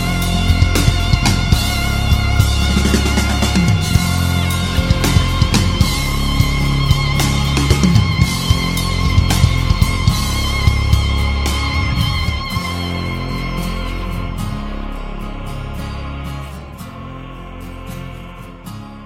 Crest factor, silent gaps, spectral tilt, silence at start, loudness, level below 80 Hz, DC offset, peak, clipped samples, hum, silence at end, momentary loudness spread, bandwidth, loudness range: 16 dB; none; -5 dB/octave; 0 s; -16 LUFS; -20 dBFS; under 0.1%; 0 dBFS; under 0.1%; none; 0 s; 16 LU; 16.5 kHz; 12 LU